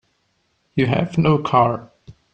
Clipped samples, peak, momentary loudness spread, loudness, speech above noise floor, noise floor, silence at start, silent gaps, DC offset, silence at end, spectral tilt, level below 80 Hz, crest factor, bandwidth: under 0.1%; -2 dBFS; 10 LU; -19 LUFS; 49 dB; -67 dBFS; 0.75 s; none; under 0.1%; 0.25 s; -8 dB/octave; -50 dBFS; 18 dB; 8.2 kHz